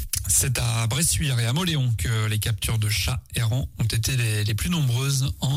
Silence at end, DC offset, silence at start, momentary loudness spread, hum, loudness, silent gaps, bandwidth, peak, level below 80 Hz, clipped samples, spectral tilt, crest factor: 0 s; under 0.1%; 0 s; 5 LU; none; -23 LUFS; none; 16 kHz; -10 dBFS; -36 dBFS; under 0.1%; -3.5 dB/octave; 14 dB